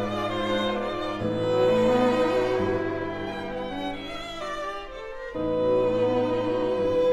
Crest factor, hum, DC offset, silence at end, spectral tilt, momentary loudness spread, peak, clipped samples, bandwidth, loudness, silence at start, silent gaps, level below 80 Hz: 14 dB; none; under 0.1%; 0 s; -6.5 dB/octave; 12 LU; -10 dBFS; under 0.1%; 11.5 kHz; -26 LUFS; 0 s; none; -48 dBFS